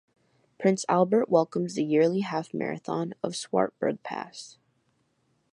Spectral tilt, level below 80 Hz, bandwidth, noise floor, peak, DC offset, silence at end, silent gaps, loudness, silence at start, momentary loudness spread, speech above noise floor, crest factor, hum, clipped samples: -6 dB/octave; -76 dBFS; 11.5 kHz; -71 dBFS; -8 dBFS; under 0.1%; 1.05 s; none; -27 LUFS; 0.6 s; 13 LU; 45 dB; 20 dB; none; under 0.1%